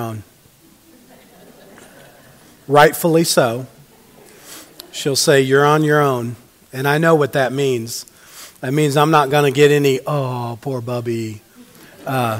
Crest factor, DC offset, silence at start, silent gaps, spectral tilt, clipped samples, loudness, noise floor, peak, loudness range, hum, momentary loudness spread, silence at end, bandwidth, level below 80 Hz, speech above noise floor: 18 dB; under 0.1%; 0 s; none; -5 dB/octave; under 0.1%; -16 LUFS; -50 dBFS; 0 dBFS; 3 LU; none; 23 LU; 0 s; 16 kHz; -60 dBFS; 34 dB